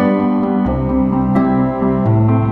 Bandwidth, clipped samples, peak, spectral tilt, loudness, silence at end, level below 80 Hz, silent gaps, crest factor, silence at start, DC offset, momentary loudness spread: 4.3 kHz; under 0.1%; -2 dBFS; -11.5 dB/octave; -15 LUFS; 0 s; -30 dBFS; none; 10 dB; 0 s; under 0.1%; 3 LU